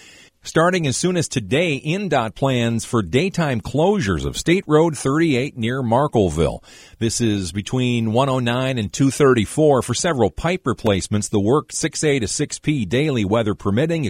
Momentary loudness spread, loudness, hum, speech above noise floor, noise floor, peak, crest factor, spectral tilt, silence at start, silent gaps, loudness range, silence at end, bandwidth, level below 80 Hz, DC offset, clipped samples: 6 LU; -19 LUFS; none; 21 dB; -40 dBFS; -2 dBFS; 16 dB; -5 dB/octave; 0.45 s; none; 2 LU; 0 s; 16 kHz; -42 dBFS; under 0.1%; under 0.1%